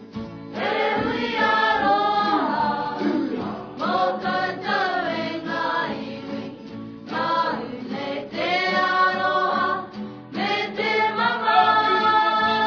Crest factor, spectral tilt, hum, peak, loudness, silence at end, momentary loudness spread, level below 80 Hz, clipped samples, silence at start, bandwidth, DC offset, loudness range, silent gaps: 18 dB; -5 dB/octave; none; -4 dBFS; -22 LUFS; 0 s; 14 LU; -60 dBFS; under 0.1%; 0 s; 5.4 kHz; under 0.1%; 5 LU; none